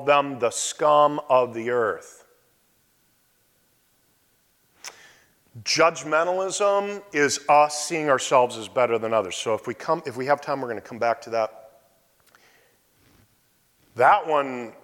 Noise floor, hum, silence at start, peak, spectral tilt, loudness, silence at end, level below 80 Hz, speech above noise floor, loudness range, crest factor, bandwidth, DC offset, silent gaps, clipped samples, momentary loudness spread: -65 dBFS; none; 0 s; -6 dBFS; -3 dB/octave; -23 LUFS; 0.15 s; -72 dBFS; 42 dB; 10 LU; 18 dB; 17 kHz; under 0.1%; none; under 0.1%; 11 LU